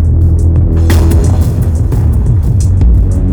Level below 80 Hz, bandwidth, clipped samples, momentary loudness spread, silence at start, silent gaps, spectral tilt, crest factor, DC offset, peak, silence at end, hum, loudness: -10 dBFS; 17.5 kHz; 0.1%; 3 LU; 0 s; none; -8 dB/octave; 8 dB; under 0.1%; 0 dBFS; 0 s; none; -10 LUFS